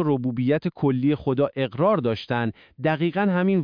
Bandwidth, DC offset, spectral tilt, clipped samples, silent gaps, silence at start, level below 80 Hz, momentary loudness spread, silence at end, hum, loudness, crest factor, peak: 5.2 kHz; under 0.1%; -9.5 dB/octave; under 0.1%; none; 0 s; -58 dBFS; 5 LU; 0 s; none; -23 LUFS; 14 dB; -10 dBFS